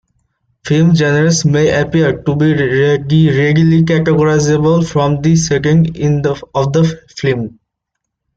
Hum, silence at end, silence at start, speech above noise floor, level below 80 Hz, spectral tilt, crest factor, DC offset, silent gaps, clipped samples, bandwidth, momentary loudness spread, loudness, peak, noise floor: none; 0.85 s; 0.65 s; 64 dB; -40 dBFS; -6.5 dB/octave; 10 dB; under 0.1%; none; under 0.1%; 7.8 kHz; 7 LU; -12 LUFS; -2 dBFS; -75 dBFS